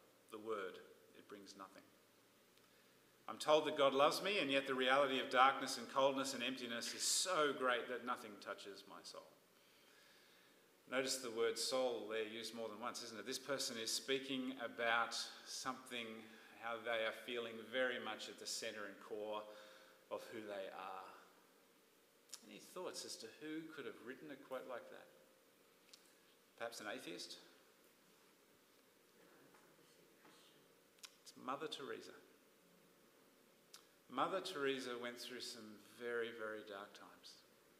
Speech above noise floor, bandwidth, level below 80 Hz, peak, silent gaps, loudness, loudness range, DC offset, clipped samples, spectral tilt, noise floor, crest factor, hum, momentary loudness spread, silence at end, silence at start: 29 dB; 15.5 kHz; under -90 dBFS; -18 dBFS; none; -42 LUFS; 17 LU; under 0.1%; under 0.1%; -2 dB/octave; -72 dBFS; 26 dB; none; 22 LU; 0.4 s; 0.3 s